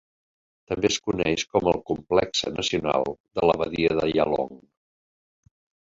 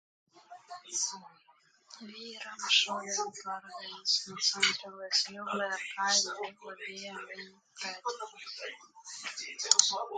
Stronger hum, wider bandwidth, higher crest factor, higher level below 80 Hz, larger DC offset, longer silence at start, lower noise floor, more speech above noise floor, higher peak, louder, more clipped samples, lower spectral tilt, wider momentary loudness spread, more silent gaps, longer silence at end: neither; second, 7.8 kHz vs 11.5 kHz; second, 22 dB vs 32 dB; first, -52 dBFS vs -88 dBFS; neither; first, 0.7 s vs 0.35 s; first, under -90 dBFS vs -59 dBFS; first, over 66 dB vs 24 dB; about the same, -4 dBFS vs -2 dBFS; first, -24 LUFS vs -31 LUFS; neither; first, -4 dB/octave vs 1 dB/octave; second, 5 LU vs 19 LU; first, 3.20-3.24 s vs none; first, 1.35 s vs 0 s